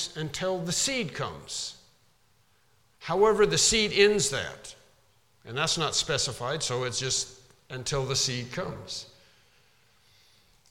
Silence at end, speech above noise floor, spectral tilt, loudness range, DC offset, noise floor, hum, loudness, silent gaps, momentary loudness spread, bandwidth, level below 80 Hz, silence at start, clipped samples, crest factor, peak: 1.65 s; 39 dB; -2.5 dB/octave; 7 LU; under 0.1%; -66 dBFS; none; -27 LUFS; none; 16 LU; 16 kHz; -54 dBFS; 0 s; under 0.1%; 22 dB; -8 dBFS